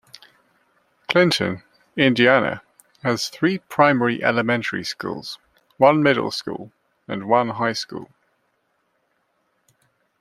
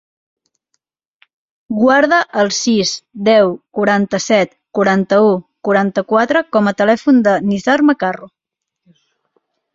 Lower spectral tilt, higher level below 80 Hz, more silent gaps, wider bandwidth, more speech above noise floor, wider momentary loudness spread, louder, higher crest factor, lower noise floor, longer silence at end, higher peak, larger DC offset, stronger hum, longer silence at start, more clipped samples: about the same, -5 dB/octave vs -4.5 dB/octave; second, -64 dBFS vs -58 dBFS; neither; first, 15 kHz vs 7.8 kHz; second, 49 dB vs 57 dB; first, 18 LU vs 7 LU; second, -20 LUFS vs -14 LUFS; first, 22 dB vs 14 dB; about the same, -69 dBFS vs -71 dBFS; first, 2.15 s vs 1.45 s; about the same, 0 dBFS vs 0 dBFS; neither; neither; second, 1.1 s vs 1.7 s; neither